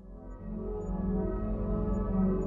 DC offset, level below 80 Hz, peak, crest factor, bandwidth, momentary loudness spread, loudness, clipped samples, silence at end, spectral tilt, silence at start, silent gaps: under 0.1%; -36 dBFS; -18 dBFS; 14 dB; 2.7 kHz; 12 LU; -33 LUFS; under 0.1%; 0 s; -11.5 dB/octave; 0 s; none